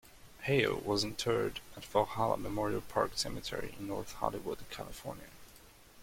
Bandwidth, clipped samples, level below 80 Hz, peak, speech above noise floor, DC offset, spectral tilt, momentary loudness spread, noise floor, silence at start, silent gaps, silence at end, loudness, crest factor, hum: 16.5 kHz; under 0.1%; -56 dBFS; -14 dBFS; 23 dB; under 0.1%; -4.5 dB/octave; 14 LU; -58 dBFS; 0.05 s; none; 0 s; -35 LUFS; 22 dB; none